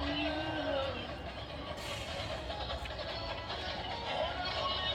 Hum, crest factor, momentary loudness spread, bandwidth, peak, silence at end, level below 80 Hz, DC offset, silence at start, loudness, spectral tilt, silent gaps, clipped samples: none; 16 dB; 7 LU; 17.5 kHz; -22 dBFS; 0 s; -50 dBFS; under 0.1%; 0 s; -37 LUFS; -4.5 dB/octave; none; under 0.1%